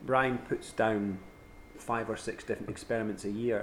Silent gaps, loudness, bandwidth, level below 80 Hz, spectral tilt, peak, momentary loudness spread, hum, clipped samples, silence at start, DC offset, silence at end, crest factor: none; -33 LUFS; 16 kHz; -58 dBFS; -6 dB/octave; -12 dBFS; 14 LU; none; under 0.1%; 0 s; under 0.1%; 0 s; 22 dB